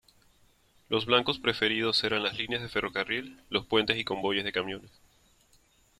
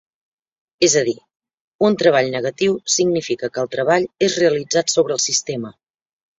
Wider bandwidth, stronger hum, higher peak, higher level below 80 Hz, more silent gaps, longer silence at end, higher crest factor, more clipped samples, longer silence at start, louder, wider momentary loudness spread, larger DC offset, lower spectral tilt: first, 14.5 kHz vs 8 kHz; neither; second, -8 dBFS vs 0 dBFS; about the same, -62 dBFS vs -60 dBFS; second, none vs 1.36-1.40 s, 1.54-1.79 s; first, 1.1 s vs 0.65 s; first, 24 dB vs 18 dB; neither; about the same, 0.9 s vs 0.8 s; second, -28 LUFS vs -18 LUFS; about the same, 8 LU vs 8 LU; neither; first, -4.5 dB/octave vs -3 dB/octave